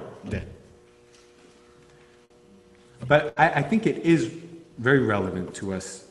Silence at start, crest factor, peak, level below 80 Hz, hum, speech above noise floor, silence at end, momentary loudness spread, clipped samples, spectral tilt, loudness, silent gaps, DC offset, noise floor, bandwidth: 0 s; 22 dB; -4 dBFS; -52 dBFS; none; 32 dB; 0.1 s; 17 LU; under 0.1%; -6 dB/octave; -24 LUFS; none; under 0.1%; -55 dBFS; 11.5 kHz